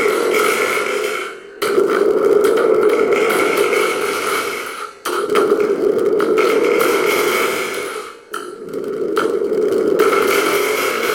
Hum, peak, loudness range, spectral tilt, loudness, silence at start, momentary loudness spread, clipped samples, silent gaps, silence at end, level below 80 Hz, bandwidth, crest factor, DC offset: none; -2 dBFS; 3 LU; -3 dB/octave; -16 LUFS; 0 s; 11 LU; under 0.1%; none; 0 s; -60 dBFS; 17 kHz; 14 dB; under 0.1%